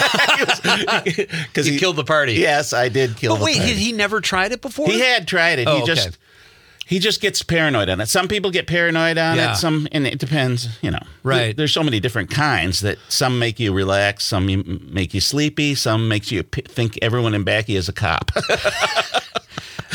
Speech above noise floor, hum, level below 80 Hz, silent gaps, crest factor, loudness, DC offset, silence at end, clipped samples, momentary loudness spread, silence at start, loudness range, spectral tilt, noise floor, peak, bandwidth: 30 dB; none; -46 dBFS; none; 18 dB; -18 LUFS; under 0.1%; 0 s; under 0.1%; 8 LU; 0 s; 3 LU; -4 dB/octave; -48 dBFS; 0 dBFS; 19.5 kHz